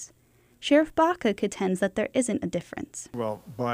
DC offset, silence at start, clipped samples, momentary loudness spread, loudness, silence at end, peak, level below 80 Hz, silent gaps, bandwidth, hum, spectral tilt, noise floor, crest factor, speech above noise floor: under 0.1%; 0 s; under 0.1%; 14 LU; -27 LUFS; 0 s; -10 dBFS; -58 dBFS; none; 15.5 kHz; none; -5 dB/octave; -61 dBFS; 18 dB; 35 dB